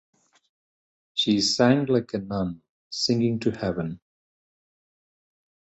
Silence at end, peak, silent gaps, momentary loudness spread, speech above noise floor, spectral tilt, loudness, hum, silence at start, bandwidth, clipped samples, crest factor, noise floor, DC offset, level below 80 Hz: 1.8 s; -6 dBFS; 2.69-2.90 s; 15 LU; over 66 dB; -5 dB/octave; -24 LUFS; none; 1.15 s; 8.2 kHz; under 0.1%; 22 dB; under -90 dBFS; under 0.1%; -56 dBFS